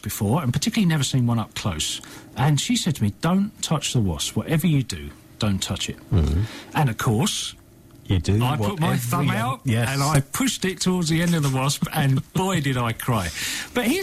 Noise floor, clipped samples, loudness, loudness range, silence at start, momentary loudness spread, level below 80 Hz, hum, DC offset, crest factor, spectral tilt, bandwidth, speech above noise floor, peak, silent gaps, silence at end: -47 dBFS; under 0.1%; -23 LUFS; 2 LU; 0.05 s; 5 LU; -40 dBFS; none; under 0.1%; 14 dB; -5 dB/octave; 16 kHz; 25 dB; -8 dBFS; none; 0 s